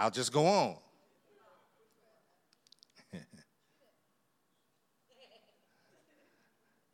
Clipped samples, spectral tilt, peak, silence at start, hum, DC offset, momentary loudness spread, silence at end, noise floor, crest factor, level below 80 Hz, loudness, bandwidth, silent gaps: under 0.1%; -4.5 dB/octave; -16 dBFS; 0 s; none; under 0.1%; 24 LU; 3.7 s; -78 dBFS; 24 dB; under -90 dBFS; -30 LUFS; 15.5 kHz; none